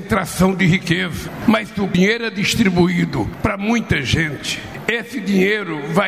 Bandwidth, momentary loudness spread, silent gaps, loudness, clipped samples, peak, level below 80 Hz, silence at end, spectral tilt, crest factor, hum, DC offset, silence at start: 15.5 kHz; 6 LU; none; -18 LUFS; under 0.1%; -2 dBFS; -38 dBFS; 0 s; -5.5 dB/octave; 16 dB; none; 0.1%; 0 s